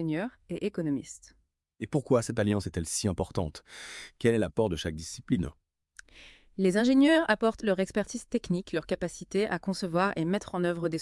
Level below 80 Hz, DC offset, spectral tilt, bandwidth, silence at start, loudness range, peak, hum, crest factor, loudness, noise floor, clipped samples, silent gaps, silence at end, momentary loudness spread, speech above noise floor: -54 dBFS; under 0.1%; -5.5 dB/octave; 12 kHz; 0 s; 4 LU; -10 dBFS; none; 20 dB; -29 LUFS; -57 dBFS; under 0.1%; none; 0 s; 14 LU; 28 dB